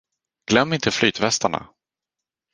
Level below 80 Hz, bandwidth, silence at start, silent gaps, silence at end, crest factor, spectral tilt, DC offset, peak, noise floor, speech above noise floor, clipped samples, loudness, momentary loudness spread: -54 dBFS; 10.5 kHz; 0.5 s; none; 0.9 s; 22 dB; -3.5 dB/octave; under 0.1%; 0 dBFS; -87 dBFS; 67 dB; under 0.1%; -20 LUFS; 10 LU